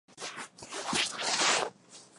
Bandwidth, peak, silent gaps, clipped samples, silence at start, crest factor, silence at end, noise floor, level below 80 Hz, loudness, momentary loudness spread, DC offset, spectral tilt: 12 kHz; -12 dBFS; none; under 0.1%; 0.1 s; 22 dB; 0.15 s; -53 dBFS; -74 dBFS; -30 LUFS; 15 LU; under 0.1%; -0.5 dB/octave